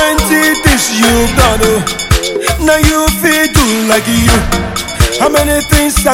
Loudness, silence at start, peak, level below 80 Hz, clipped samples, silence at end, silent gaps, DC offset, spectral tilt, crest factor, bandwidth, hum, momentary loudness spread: -10 LUFS; 0 s; 0 dBFS; -18 dBFS; 0.4%; 0 s; none; under 0.1%; -3.5 dB/octave; 10 dB; 17.5 kHz; none; 4 LU